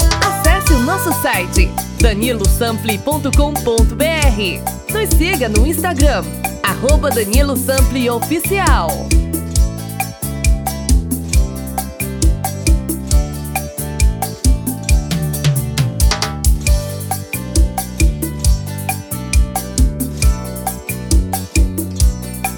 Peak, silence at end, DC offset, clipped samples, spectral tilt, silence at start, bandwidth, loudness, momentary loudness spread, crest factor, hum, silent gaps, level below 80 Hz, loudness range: 0 dBFS; 0 s; under 0.1%; under 0.1%; -4.5 dB/octave; 0 s; over 20 kHz; -16 LUFS; 7 LU; 14 dB; none; none; -18 dBFS; 3 LU